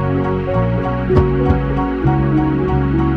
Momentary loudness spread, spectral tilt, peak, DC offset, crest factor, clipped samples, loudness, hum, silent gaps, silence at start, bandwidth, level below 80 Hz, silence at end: 3 LU; -10 dB/octave; 0 dBFS; under 0.1%; 14 dB; under 0.1%; -16 LUFS; none; none; 0 s; 5.2 kHz; -24 dBFS; 0 s